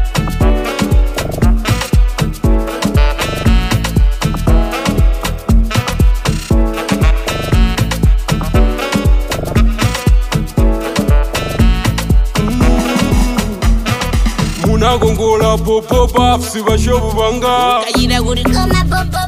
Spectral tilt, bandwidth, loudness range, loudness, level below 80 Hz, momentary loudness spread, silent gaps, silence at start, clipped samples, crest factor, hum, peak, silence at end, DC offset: -5.5 dB/octave; 16 kHz; 2 LU; -14 LUFS; -14 dBFS; 4 LU; none; 0 s; under 0.1%; 12 dB; none; 0 dBFS; 0 s; under 0.1%